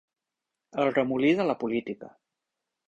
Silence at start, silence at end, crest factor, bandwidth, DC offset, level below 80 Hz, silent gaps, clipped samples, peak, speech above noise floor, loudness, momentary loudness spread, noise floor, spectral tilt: 0.75 s; 0.8 s; 18 dB; 8 kHz; under 0.1%; -68 dBFS; none; under 0.1%; -10 dBFS; 60 dB; -26 LUFS; 15 LU; -87 dBFS; -7 dB/octave